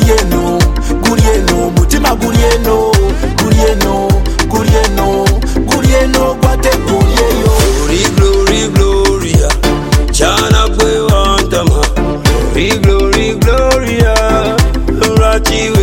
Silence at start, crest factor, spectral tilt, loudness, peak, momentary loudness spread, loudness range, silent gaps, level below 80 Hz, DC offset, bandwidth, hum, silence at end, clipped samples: 0 s; 10 dB; -5 dB/octave; -10 LUFS; 0 dBFS; 3 LU; 1 LU; none; -14 dBFS; under 0.1%; 17.5 kHz; none; 0 s; under 0.1%